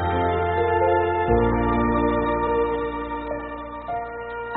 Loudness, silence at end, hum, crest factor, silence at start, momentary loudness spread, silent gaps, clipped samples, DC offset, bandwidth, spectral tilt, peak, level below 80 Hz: -23 LUFS; 0 s; none; 16 dB; 0 s; 11 LU; none; under 0.1%; under 0.1%; 4.1 kHz; -6 dB/octave; -8 dBFS; -36 dBFS